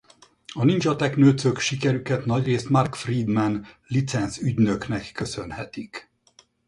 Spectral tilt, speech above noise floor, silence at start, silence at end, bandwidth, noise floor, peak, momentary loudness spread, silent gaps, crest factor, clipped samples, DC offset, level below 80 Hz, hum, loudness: -6 dB/octave; 36 dB; 0.5 s; 0.65 s; 11 kHz; -59 dBFS; -6 dBFS; 15 LU; none; 18 dB; under 0.1%; under 0.1%; -52 dBFS; none; -23 LUFS